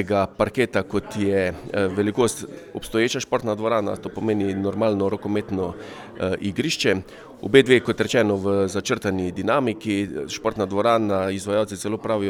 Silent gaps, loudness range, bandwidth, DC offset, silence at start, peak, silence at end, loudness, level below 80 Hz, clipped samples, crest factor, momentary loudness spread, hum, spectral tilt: none; 4 LU; 16.5 kHz; under 0.1%; 0 s; 0 dBFS; 0 s; -22 LUFS; -52 dBFS; under 0.1%; 22 dB; 8 LU; none; -5 dB/octave